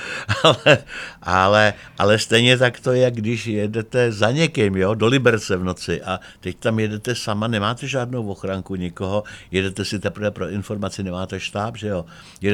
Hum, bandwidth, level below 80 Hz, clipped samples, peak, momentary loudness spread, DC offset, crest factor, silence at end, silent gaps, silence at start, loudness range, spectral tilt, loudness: none; 14.5 kHz; -52 dBFS; under 0.1%; 0 dBFS; 12 LU; under 0.1%; 20 dB; 0 s; none; 0 s; 8 LU; -5 dB/octave; -20 LUFS